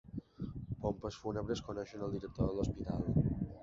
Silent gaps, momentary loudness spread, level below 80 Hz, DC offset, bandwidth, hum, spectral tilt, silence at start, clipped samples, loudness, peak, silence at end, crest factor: none; 11 LU; -50 dBFS; under 0.1%; 7.6 kHz; none; -8 dB/octave; 0.05 s; under 0.1%; -39 LUFS; -20 dBFS; 0 s; 18 dB